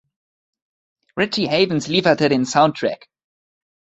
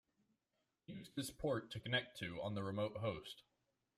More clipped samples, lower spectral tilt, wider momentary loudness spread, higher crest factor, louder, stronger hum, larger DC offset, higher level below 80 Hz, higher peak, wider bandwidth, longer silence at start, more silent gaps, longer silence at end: neither; about the same, -5 dB/octave vs -5 dB/octave; second, 9 LU vs 14 LU; about the same, 20 dB vs 20 dB; first, -18 LUFS vs -44 LUFS; neither; neither; first, -58 dBFS vs -70 dBFS; first, 0 dBFS vs -24 dBFS; second, 8.2 kHz vs 15.5 kHz; first, 1.15 s vs 0.9 s; neither; first, 1.05 s vs 0.55 s